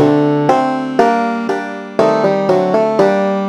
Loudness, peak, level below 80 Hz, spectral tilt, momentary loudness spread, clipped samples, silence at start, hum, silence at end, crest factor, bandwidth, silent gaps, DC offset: -14 LUFS; 0 dBFS; -56 dBFS; -7 dB/octave; 6 LU; under 0.1%; 0 s; none; 0 s; 14 dB; 11 kHz; none; under 0.1%